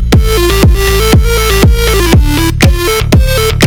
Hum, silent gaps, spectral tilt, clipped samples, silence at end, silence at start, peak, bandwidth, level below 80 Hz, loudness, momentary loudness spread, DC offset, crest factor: none; none; -5 dB/octave; 0.2%; 0 s; 0 s; 0 dBFS; 19.5 kHz; -12 dBFS; -8 LUFS; 2 LU; under 0.1%; 6 dB